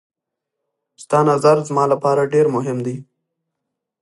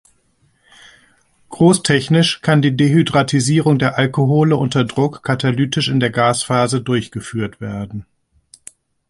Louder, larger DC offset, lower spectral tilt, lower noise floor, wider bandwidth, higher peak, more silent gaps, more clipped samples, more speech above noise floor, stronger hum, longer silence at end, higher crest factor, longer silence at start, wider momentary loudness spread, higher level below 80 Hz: about the same, -17 LUFS vs -16 LUFS; neither; first, -7 dB/octave vs -5.5 dB/octave; first, -80 dBFS vs -59 dBFS; about the same, 11.5 kHz vs 11.5 kHz; about the same, -2 dBFS vs 0 dBFS; neither; neither; first, 64 dB vs 44 dB; neither; about the same, 1 s vs 1.05 s; about the same, 18 dB vs 16 dB; second, 1 s vs 1.5 s; about the same, 11 LU vs 11 LU; second, -68 dBFS vs -50 dBFS